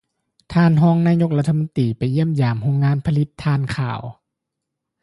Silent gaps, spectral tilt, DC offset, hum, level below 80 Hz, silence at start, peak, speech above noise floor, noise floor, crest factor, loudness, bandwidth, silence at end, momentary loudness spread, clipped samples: none; -8.5 dB/octave; under 0.1%; none; -48 dBFS; 0.5 s; -6 dBFS; 63 dB; -80 dBFS; 14 dB; -19 LUFS; 11.5 kHz; 0.9 s; 9 LU; under 0.1%